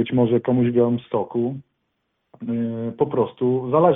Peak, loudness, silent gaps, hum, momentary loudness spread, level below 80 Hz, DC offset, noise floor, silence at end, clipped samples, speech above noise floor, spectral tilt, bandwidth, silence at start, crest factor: -4 dBFS; -22 LUFS; none; none; 9 LU; -60 dBFS; under 0.1%; -74 dBFS; 0 s; under 0.1%; 54 dB; -12.5 dB/octave; 3.9 kHz; 0 s; 16 dB